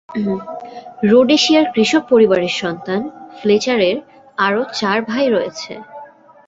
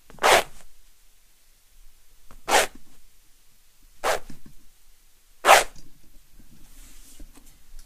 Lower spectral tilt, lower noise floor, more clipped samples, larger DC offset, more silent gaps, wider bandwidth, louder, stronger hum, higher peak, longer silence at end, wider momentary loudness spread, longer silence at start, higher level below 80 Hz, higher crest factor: first, -4.5 dB/octave vs -0.5 dB/octave; second, -39 dBFS vs -55 dBFS; neither; neither; neither; second, 8 kHz vs 15.5 kHz; first, -16 LUFS vs -21 LUFS; neither; about the same, -2 dBFS vs 0 dBFS; first, 0.4 s vs 0.05 s; about the same, 18 LU vs 17 LU; about the same, 0.1 s vs 0.1 s; second, -60 dBFS vs -48 dBFS; second, 14 dB vs 28 dB